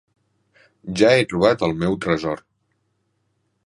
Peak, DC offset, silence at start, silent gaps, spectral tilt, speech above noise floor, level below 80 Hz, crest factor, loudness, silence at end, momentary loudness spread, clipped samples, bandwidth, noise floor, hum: -2 dBFS; under 0.1%; 0.85 s; none; -5.5 dB/octave; 51 dB; -50 dBFS; 20 dB; -19 LUFS; 1.3 s; 15 LU; under 0.1%; 11.5 kHz; -70 dBFS; none